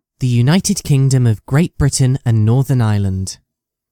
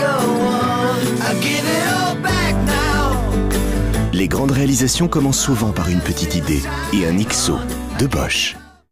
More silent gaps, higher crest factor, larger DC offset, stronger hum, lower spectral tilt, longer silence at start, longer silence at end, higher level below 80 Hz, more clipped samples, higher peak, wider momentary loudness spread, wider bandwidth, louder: neither; about the same, 14 dB vs 10 dB; neither; neither; first, -6 dB/octave vs -4.5 dB/octave; first, 0.2 s vs 0 s; first, 0.55 s vs 0.25 s; second, -36 dBFS vs -26 dBFS; neither; first, 0 dBFS vs -6 dBFS; first, 7 LU vs 4 LU; about the same, 15.5 kHz vs 16 kHz; first, -15 LUFS vs -18 LUFS